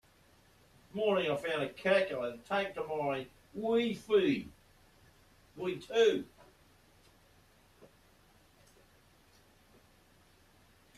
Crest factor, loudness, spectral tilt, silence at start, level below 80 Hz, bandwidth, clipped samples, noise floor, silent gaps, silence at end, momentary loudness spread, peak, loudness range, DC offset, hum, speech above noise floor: 20 dB; -33 LUFS; -5 dB/octave; 0.95 s; -70 dBFS; 14 kHz; under 0.1%; -65 dBFS; none; 3.15 s; 12 LU; -16 dBFS; 4 LU; under 0.1%; none; 33 dB